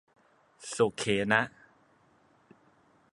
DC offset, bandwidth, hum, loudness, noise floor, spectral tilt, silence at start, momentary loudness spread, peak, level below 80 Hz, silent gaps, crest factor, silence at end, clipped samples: under 0.1%; 11.5 kHz; none; -29 LUFS; -65 dBFS; -4 dB/octave; 0.6 s; 14 LU; -8 dBFS; -68 dBFS; none; 26 dB; 1.65 s; under 0.1%